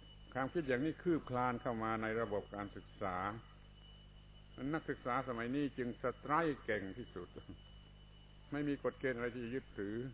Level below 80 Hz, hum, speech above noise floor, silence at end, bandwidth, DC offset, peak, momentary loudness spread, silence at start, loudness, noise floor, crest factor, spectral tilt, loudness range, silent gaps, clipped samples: -60 dBFS; 50 Hz at -60 dBFS; 19 dB; 0 s; 4 kHz; under 0.1%; -20 dBFS; 22 LU; 0 s; -40 LUFS; -59 dBFS; 20 dB; -5.5 dB/octave; 4 LU; none; under 0.1%